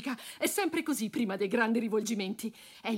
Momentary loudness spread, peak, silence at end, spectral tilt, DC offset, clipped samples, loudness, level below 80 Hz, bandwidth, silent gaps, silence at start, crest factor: 10 LU; -16 dBFS; 0 s; -4 dB/octave; under 0.1%; under 0.1%; -32 LUFS; -78 dBFS; 16 kHz; none; 0 s; 16 dB